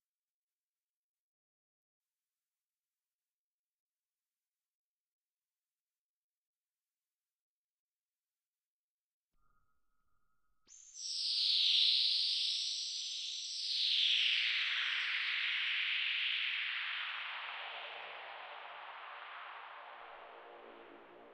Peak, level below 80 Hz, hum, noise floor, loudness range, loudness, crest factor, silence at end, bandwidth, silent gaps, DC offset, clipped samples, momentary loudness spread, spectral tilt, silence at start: -18 dBFS; under -90 dBFS; none; under -90 dBFS; 16 LU; -33 LUFS; 22 dB; 0 s; 10.5 kHz; none; under 0.1%; under 0.1%; 21 LU; 4 dB/octave; 10.7 s